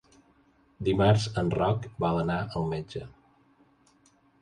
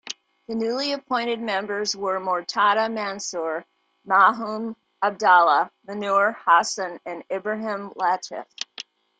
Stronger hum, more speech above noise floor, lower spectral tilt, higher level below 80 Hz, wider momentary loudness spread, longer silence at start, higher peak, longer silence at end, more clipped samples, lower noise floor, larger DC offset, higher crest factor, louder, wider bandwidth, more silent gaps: neither; first, 37 dB vs 20 dB; first, -7 dB/octave vs -2.5 dB/octave; first, -50 dBFS vs -74 dBFS; about the same, 14 LU vs 16 LU; first, 0.8 s vs 0.05 s; second, -10 dBFS vs -4 dBFS; first, 1.3 s vs 0.35 s; neither; first, -64 dBFS vs -43 dBFS; neither; about the same, 20 dB vs 20 dB; second, -28 LUFS vs -23 LUFS; first, 10.5 kHz vs 9.4 kHz; neither